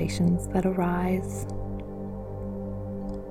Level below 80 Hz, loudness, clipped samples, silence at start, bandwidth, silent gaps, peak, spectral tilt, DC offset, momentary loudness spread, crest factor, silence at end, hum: -40 dBFS; -29 LUFS; under 0.1%; 0 s; 15 kHz; none; -12 dBFS; -7 dB/octave; under 0.1%; 11 LU; 16 dB; 0 s; 50 Hz at -45 dBFS